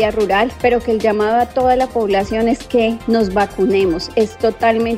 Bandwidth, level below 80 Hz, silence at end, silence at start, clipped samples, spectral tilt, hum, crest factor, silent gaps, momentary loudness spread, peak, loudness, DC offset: 16 kHz; -38 dBFS; 0 s; 0 s; under 0.1%; -5.5 dB/octave; none; 14 dB; none; 2 LU; -2 dBFS; -16 LUFS; under 0.1%